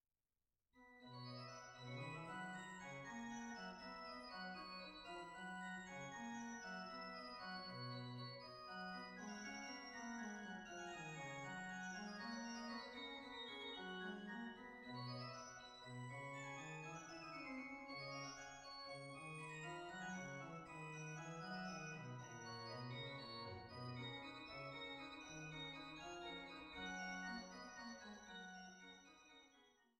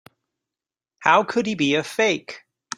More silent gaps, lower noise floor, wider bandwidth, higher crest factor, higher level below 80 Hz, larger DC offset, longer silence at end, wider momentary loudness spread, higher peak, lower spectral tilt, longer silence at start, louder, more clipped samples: neither; about the same, under -90 dBFS vs under -90 dBFS; about the same, 15.5 kHz vs 15.5 kHz; second, 14 dB vs 22 dB; second, -78 dBFS vs -68 dBFS; neither; second, 0.15 s vs 0.4 s; second, 5 LU vs 14 LU; second, -38 dBFS vs -2 dBFS; about the same, -4 dB/octave vs -4 dB/octave; second, 0.75 s vs 1 s; second, -52 LUFS vs -21 LUFS; neither